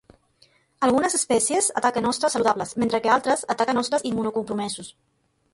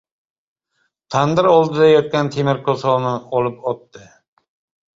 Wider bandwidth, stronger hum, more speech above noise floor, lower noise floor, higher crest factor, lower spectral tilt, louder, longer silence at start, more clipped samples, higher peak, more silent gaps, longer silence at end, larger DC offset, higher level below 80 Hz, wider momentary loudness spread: first, 11.5 kHz vs 7.6 kHz; neither; second, 38 dB vs 53 dB; second, -61 dBFS vs -69 dBFS; about the same, 18 dB vs 16 dB; second, -3 dB/octave vs -6.5 dB/octave; second, -22 LUFS vs -17 LUFS; second, 0.8 s vs 1.1 s; neither; second, -6 dBFS vs -2 dBFS; neither; second, 0.65 s vs 1 s; neither; about the same, -60 dBFS vs -58 dBFS; second, 8 LU vs 11 LU